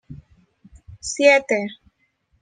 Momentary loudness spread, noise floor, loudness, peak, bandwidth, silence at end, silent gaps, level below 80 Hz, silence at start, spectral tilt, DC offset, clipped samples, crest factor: 18 LU; -66 dBFS; -18 LUFS; -2 dBFS; 9.8 kHz; 0.65 s; none; -54 dBFS; 0.1 s; -3 dB/octave; under 0.1%; under 0.1%; 22 dB